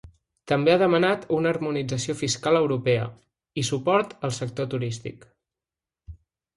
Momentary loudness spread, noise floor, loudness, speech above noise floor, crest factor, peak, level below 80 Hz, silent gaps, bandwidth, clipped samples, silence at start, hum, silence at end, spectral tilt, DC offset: 11 LU; -90 dBFS; -24 LUFS; 66 dB; 18 dB; -6 dBFS; -56 dBFS; none; 11.5 kHz; under 0.1%; 0.05 s; none; 0.4 s; -5 dB/octave; under 0.1%